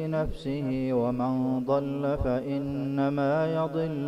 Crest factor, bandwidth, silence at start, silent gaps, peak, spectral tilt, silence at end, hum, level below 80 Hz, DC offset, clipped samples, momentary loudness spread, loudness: 14 dB; 8.8 kHz; 0 s; none; -14 dBFS; -9 dB/octave; 0 s; none; -44 dBFS; under 0.1%; under 0.1%; 4 LU; -28 LUFS